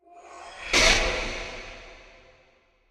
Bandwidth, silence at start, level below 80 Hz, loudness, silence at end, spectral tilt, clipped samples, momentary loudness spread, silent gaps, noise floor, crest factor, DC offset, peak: 15 kHz; 0.15 s; -38 dBFS; -22 LUFS; 0.95 s; -1.5 dB/octave; under 0.1%; 25 LU; none; -62 dBFS; 24 dB; under 0.1%; -4 dBFS